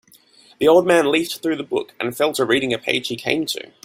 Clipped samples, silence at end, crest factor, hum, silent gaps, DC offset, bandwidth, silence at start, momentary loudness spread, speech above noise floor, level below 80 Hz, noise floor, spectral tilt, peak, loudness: under 0.1%; 0.25 s; 18 dB; none; none; under 0.1%; 16.5 kHz; 0.6 s; 9 LU; 32 dB; -60 dBFS; -51 dBFS; -4 dB/octave; -2 dBFS; -19 LUFS